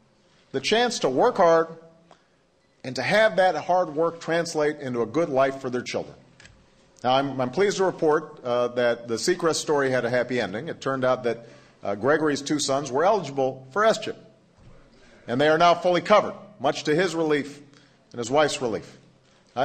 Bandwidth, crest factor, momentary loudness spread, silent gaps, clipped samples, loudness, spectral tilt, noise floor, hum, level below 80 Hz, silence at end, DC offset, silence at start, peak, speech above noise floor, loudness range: 13.5 kHz; 20 dB; 12 LU; none; under 0.1%; -24 LUFS; -4 dB/octave; -63 dBFS; none; -64 dBFS; 0 s; under 0.1%; 0.55 s; -4 dBFS; 40 dB; 3 LU